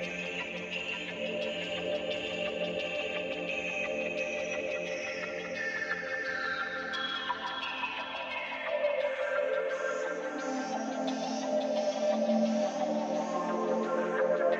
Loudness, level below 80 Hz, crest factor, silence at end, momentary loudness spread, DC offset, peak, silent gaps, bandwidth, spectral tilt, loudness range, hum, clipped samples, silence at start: -33 LUFS; -70 dBFS; 16 dB; 0 s; 5 LU; under 0.1%; -16 dBFS; none; 8.2 kHz; -4 dB/octave; 3 LU; none; under 0.1%; 0 s